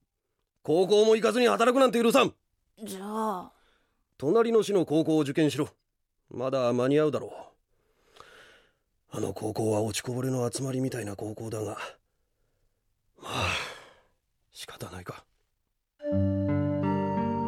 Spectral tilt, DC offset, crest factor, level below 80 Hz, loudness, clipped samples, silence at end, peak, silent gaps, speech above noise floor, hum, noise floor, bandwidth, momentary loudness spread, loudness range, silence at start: -5.5 dB/octave; under 0.1%; 20 dB; -64 dBFS; -27 LUFS; under 0.1%; 0 s; -8 dBFS; none; 54 dB; none; -81 dBFS; 16 kHz; 19 LU; 12 LU; 0.65 s